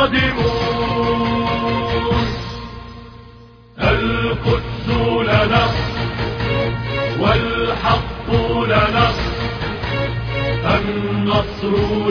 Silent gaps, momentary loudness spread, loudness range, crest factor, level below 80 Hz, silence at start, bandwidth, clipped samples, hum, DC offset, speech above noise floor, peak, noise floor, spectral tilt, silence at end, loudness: none; 7 LU; 3 LU; 16 dB; -30 dBFS; 0 s; 5.4 kHz; under 0.1%; none; under 0.1%; 25 dB; -2 dBFS; -42 dBFS; -7 dB/octave; 0 s; -18 LUFS